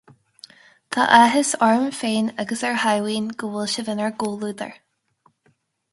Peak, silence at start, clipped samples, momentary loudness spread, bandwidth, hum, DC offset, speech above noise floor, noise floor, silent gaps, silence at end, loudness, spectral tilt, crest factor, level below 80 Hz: 0 dBFS; 0.9 s; under 0.1%; 14 LU; 11.5 kHz; none; under 0.1%; 44 dB; -65 dBFS; none; 1.2 s; -20 LUFS; -3.5 dB/octave; 22 dB; -68 dBFS